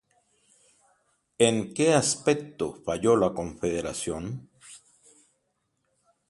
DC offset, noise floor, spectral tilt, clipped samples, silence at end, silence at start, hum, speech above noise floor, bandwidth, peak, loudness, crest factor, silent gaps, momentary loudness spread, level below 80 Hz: under 0.1%; -76 dBFS; -4 dB/octave; under 0.1%; 1.5 s; 1.4 s; none; 50 dB; 11.5 kHz; -4 dBFS; -26 LUFS; 24 dB; none; 17 LU; -56 dBFS